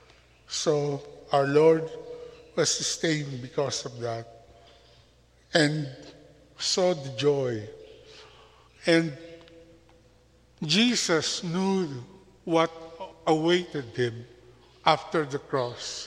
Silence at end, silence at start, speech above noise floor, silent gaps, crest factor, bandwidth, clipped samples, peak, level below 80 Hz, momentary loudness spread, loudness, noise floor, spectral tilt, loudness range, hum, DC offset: 0 s; 0.5 s; 34 dB; none; 24 dB; 12.5 kHz; under 0.1%; -4 dBFS; -64 dBFS; 19 LU; -26 LUFS; -60 dBFS; -4 dB/octave; 4 LU; none; under 0.1%